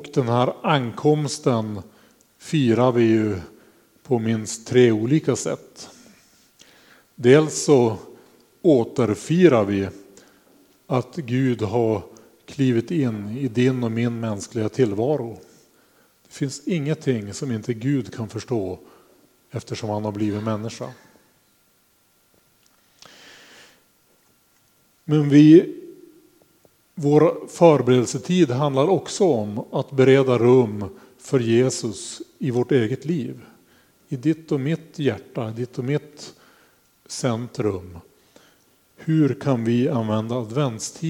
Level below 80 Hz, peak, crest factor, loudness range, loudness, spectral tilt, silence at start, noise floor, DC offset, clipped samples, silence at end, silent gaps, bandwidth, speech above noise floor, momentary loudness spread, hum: -64 dBFS; 0 dBFS; 20 dB; 10 LU; -21 LUFS; -6.5 dB/octave; 0 s; -62 dBFS; under 0.1%; under 0.1%; 0 s; none; 16 kHz; 42 dB; 17 LU; none